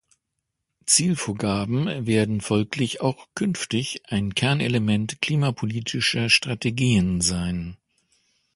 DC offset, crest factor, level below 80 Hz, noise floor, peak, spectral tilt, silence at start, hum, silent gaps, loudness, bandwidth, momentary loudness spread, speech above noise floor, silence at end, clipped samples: under 0.1%; 20 dB; -48 dBFS; -80 dBFS; -4 dBFS; -4 dB/octave; 0.85 s; none; none; -23 LUFS; 11.5 kHz; 8 LU; 57 dB; 0.8 s; under 0.1%